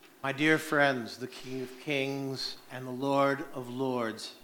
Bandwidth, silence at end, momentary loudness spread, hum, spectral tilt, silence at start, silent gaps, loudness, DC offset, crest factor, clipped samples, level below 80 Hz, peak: 19 kHz; 0.05 s; 13 LU; none; -5 dB/octave; 0.05 s; none; -31 LUFS; under 0.1%; 22 dB; under 0.1%; -70 dBFS; -10 dBFS